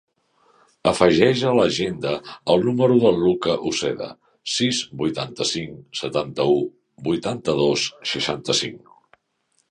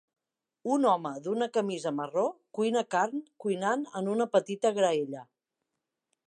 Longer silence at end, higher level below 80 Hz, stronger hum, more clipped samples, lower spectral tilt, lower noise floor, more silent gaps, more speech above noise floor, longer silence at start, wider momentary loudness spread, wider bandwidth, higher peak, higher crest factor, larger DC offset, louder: about the same, 0.95 s vs 1.05 s; first, -54 dBFS vs -86 dBFS; neither; neither; about the same, -4.5 dB/octave vs -5 dB/octave; second, -69 dBFS vs -86 dBFS; neither; second, 48 dB vs 57 dB; first, 0.85 s vs 0.65 s; first, 12 LU vs 7 LU; about the same, 11 kHz vs 10.5 kHz; first, -2 dBFS vs -12 dBFS; about the same, 20 dB vs 18 dB; neither; first, -21 LUFS vs -30 LUFS